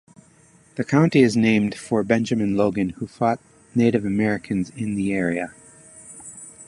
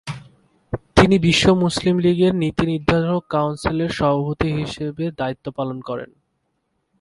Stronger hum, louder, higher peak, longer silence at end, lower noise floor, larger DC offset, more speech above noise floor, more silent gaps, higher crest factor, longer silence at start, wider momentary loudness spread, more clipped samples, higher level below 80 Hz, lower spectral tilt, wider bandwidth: neither; about the same, -21 LUFS vs -19 LUFS; second, -4 dBFS vs 0 dBFS; second, 0.05 s vs 0.95 s; second, -54 dBFS vs -71 dBFS; neither; second, 34 dB vs 52 dB; neither; about the same, 18 dB vs 20 dB; first, 0.75 s vs 0.05 s; first, 19 LU vs 15 LU; neither; second, -54 dBFS vs -40 dBFS; about the same, -6.5 dB/octave vs -6 dB/octave; about the same, 11.5 kHz vs 11.5 kHz